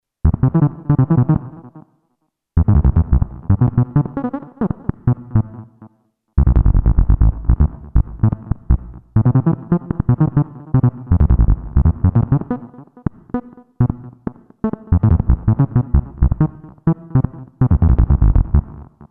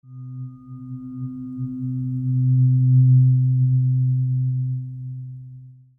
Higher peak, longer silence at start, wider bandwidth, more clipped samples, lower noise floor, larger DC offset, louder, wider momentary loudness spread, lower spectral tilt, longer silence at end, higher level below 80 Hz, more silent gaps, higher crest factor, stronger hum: first, -2 dBFS vs -8 dBFS; first, 0.25 s vs 0.1 s; first, 2.5 kHz vs 1.3 kHz; neither; first, -70 dBFS vs -43 dBFS; neither; about the same, -17 LUFS vs -19 LUFS; second, 11 LU vs 21 LU; about the same, -14 dB/octave vs -14.5 dB/octave; about the same, 0.25 s vs 0.25 s; first, -20 dBFS vs -56 dBFS; neither; about the same, 14 dB vs 12 dB; neither